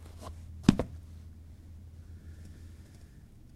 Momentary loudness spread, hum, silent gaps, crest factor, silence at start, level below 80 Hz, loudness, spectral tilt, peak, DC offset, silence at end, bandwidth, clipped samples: 26 LU; none; none; 32 dB; 0 s; -48 dBFS; -30 LUFS; -6.5 dB/octave; -4 dBFS; under 0.1%; 0 s; 14 kHz; under 0.1%